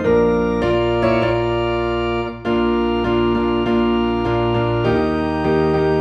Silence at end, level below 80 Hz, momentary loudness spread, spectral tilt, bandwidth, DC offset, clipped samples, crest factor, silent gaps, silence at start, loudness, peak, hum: 0 s; -34 dBFS; 3 LU; -8 dB/octave; 7.4 kHz; under 0.1%; under 0.1%; 12 dB; none; 0 s; -18 LUFS; -4 dBFS; none